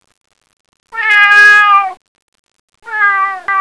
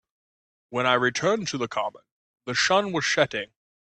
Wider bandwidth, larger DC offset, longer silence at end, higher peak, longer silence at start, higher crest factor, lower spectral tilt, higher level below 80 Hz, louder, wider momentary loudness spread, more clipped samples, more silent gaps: first, 11 kHz vs 9.2 kHz; neither; second, 0 s vs 0.4 s; first, 0 dBFS vs -8 dBFS; first, 0.95 s vs 0.7 s; second, 12 dB vs 18 dB; second, 1.5 dB/octave vs -3 dB/octave; about the same, -64 dBFS vs -66 dBFS; first, -7 LUFS vs -24 LUFS; first, 18 LU vs 12 LU; first, 0.6% vs under 0.1%; first, 2.08-2.15 s, 2.22-2.32 s, 2.39-2.44 s, 2.60-2.68 s vs 2.12-2.34 s